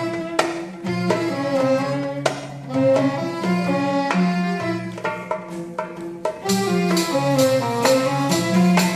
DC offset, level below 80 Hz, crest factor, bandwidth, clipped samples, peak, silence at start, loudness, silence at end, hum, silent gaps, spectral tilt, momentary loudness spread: under 0.1%; -60 dBFS; 20 dB; 14 kHz; under 0.1%; -2 dBFS; 0 s; -21 LUFS; 0 s; none; none; -5.5 dB/octave; 11 LU